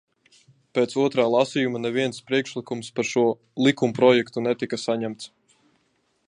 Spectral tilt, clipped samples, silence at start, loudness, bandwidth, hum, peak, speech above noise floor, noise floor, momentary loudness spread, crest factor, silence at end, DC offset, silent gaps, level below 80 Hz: -5 dB/octave; under 0.1%; 0.75 s; -23 LUFS; 10.5 kHz; none; -4 dBFS; 46 dB; -69 dBFS; 12 LU; 20 dB; 1.05 s; under 0.1%; none; -70 dBFS